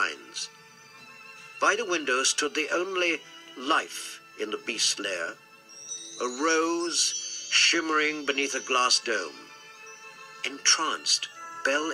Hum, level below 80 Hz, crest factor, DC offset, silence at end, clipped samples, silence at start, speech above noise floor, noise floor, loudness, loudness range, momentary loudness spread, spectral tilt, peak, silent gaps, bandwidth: none; -80 dBFS; 22 dB; under 0.1%; 0 s; under 0.1%; 0 s; 24 dB; -51 dBFS; -26 LUFS; 5 LU; 22 LU; 0.5 dB/octave; -8 dBFS; none; 15.5 kHz